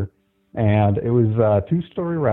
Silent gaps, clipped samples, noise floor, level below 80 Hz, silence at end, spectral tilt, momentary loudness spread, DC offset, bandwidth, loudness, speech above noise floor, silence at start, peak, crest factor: none; under 0.1%; -40 dBFS; -48 dBFS; 0 s; -12.5 dB/octave; 9 LU; under 0.1%; 3.8 kHz; -19 LUFS; 22 dB; 0 s; -4 dBFS; 14 dB